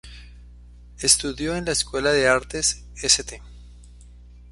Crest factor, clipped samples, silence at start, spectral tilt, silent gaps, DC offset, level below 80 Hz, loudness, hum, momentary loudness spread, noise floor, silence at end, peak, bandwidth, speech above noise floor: 22 dB; under 0.1%; 0.05 s; -1.5 dB/octave; none; under 0.1%; -42 dBFS; -21 LUFS; 60 Hz at -40 dBFS; 9 LU; -45 dBFS; 0.05 s; -2 dBFS; 12 kHz; 23 dB